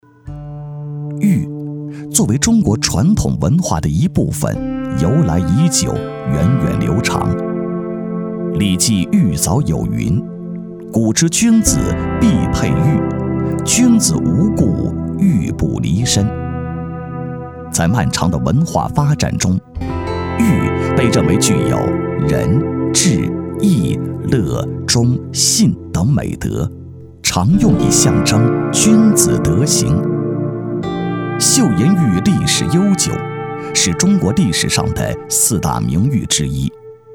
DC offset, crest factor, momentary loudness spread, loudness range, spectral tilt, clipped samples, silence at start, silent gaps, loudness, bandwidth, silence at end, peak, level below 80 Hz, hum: 0.2%; 14 dB; 11 LU; 4 LU; -5 dB/octave; under 0.1%; 0.25 s; none; -15 LUFS; 18.5 kHz; 0 s; 0 dBFS; -32 dBFS; none